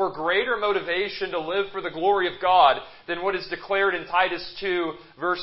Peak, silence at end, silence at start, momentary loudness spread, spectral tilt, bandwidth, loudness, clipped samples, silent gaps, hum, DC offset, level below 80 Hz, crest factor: -4 dBFS; 0 s; 0 s; 11 LU; -8 dB/octave; 5.8 kHz; -24 LUFS; under 0.1%; none; none; under 0.1%; -58 dBFS; 20 dB